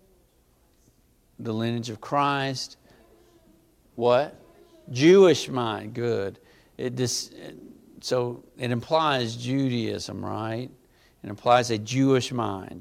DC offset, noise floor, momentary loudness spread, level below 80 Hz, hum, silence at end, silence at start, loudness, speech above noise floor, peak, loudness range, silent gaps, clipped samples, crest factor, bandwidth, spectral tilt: under 0.1%; -63 dBFS; 16 LU; -64 dBFS; none; 0 s; 1.4 s; -25 LUFS; 38 dB; -6 dBFS; 7 LU; none; under 0.1%; 20 dB; 15 kHz; -5 dB/octave